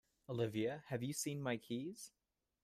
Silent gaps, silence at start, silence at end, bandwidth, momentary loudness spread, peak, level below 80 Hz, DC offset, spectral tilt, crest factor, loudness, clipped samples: none; 0.3 s; 0.55 s; 15.5 kHz; 10 LU; -26 dBFS; -78 dBFS; under 0.1%; -5 dB/octave; 18 dB; -43 LUFS; under 0.1%